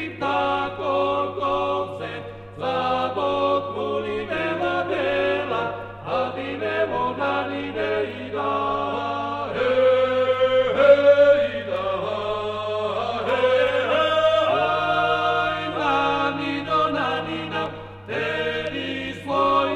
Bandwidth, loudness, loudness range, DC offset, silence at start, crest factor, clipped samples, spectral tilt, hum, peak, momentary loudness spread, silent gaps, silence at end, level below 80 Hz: 8.8 kHz; -22 LUFS; 6 LU; under 0.1%; 0 s; 18 dB; under 0.1%; -5.5 dB/octave; none; -4 dBFS; 9 LU; none; 0 s; -54 dBFS